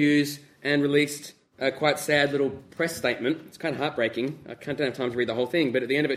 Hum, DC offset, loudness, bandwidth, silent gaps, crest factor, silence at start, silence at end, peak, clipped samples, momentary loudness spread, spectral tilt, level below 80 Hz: none; under 0.1%; -26 LUFS; 16 kHz; none; 20 dB; 0 s; 0 s; -6 dBFS; under 0.1%; 10 LU; -4.5 dB/octave; -66 dBFS